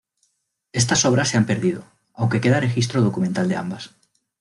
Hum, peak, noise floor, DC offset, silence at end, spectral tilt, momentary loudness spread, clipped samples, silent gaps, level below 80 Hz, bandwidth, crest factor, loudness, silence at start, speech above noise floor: none; -4 dBFS; -69 dBFS; under 0.1%; 0.55 s; -4.5 dB/octave; 13 LU; under 0.1%; none; -56 dBFS; 12 kHz; 16 dB; -20 LUFS; 0.75 s; 50 dB